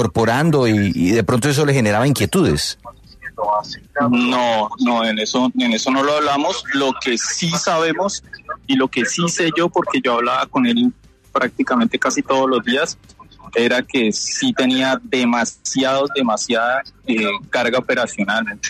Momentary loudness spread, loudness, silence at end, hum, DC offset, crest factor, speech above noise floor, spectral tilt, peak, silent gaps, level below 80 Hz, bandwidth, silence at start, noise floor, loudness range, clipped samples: 5 LU; -17 LUFS; 0 s; none; under 0.1%; 14 dB; 19 dB; -4 dB/octave; -4 dBFS; none; -48 dBFS; 13.5 kHz; 0 s; -37 dBFS; 1 LU; under 0.1%